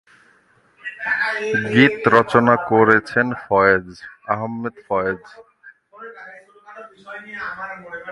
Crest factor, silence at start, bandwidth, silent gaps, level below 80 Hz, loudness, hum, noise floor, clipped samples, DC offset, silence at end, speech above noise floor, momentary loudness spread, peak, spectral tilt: 20 dB; 0.85 s; 11.5 kHz; none; -56 dBFS; -18 LUFS; none; -57 dBFS; under 0.1%; under 0.1%; 0 s; 38 dB; 22 LU; 0 dBFS; -6.5 dB/octave